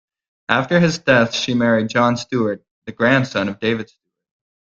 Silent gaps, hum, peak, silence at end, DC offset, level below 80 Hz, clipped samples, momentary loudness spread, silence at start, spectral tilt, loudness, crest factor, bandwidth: 2.71-2.82 s; none; 0 dBFS; 0.9 s; under 0.1%; -56 dBFS; under 0.1%; 12 LU; 0.5 s; -5.5 dB/octave; -18 LUFS; 18 dB; 7.6 kHz